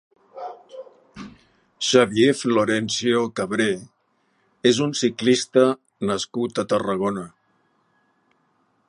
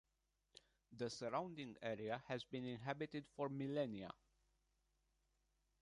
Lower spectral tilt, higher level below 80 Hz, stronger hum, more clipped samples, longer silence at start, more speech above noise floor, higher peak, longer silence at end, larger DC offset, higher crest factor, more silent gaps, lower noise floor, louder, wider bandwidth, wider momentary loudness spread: second, -4 dB/octave vs -6 dB/octave; first, -62 dBFS vs -80 dBFS; neither; neither; second, 0.35 s vs 0.9 s; first, 46 dB vs 40 dB; first, -2 dBFS vs -30 dBFS; about the same, 1.6 s vs 1.7 s; neither; about the same, 22 dB vs 20 dB; neither; second, -67 dBFS vs -87 dBFS; first, -21 LUFS vs -47 LUFS; about the same, 11 kHz vs 11 kHz; about the same, 23 LU vs 22 LU